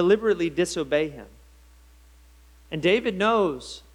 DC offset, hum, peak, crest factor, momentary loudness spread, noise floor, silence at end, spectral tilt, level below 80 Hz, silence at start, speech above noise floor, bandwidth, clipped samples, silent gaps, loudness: under 0.1%; none; -8 dBFS; 18 dB; 13 LU; -52 dBFS; 0.15 s; -5 dB/octave; -52 dBFS; 0 s; 29 dB; 13 kHz; under 0.1%; none; -24 LUFS